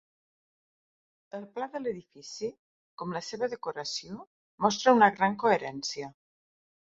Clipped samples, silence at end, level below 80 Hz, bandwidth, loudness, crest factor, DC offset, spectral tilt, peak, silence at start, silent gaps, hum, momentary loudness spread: under 0.1%; 0.75 s; -74 dBFS; 7.8 kHz; -29 LUFS; 24 dB; under 0.1%; -4 dB/octave; -8 dBFS; 1.35 s; 2.59-2.98 s, 4.27-4.58 s; none; 21 LU